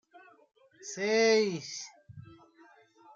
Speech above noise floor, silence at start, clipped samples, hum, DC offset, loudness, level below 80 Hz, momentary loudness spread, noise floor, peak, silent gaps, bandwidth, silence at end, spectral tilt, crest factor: 32 dB; 0.15 s; under 0.1%; none; under 0.1%; -29 LUFS; -78 dBFS; 27 LU; -60 dBFS; -14 dBFS; none; 7.6 kHz; 0.95 s; -3 dB/octave; 18 dB